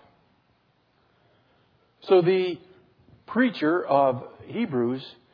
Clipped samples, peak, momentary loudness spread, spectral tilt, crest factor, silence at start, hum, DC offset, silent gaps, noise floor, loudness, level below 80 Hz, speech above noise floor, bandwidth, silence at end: under 0.1%; -8 dBFS; 15 LU; -8.5 dB/octave; 20 dB; 2.05 s; none; under 0.1%; none; -66 dBFS; -24 LUFS; -72 dBFS; 43 dB; 5.2 kHz; 0.2 s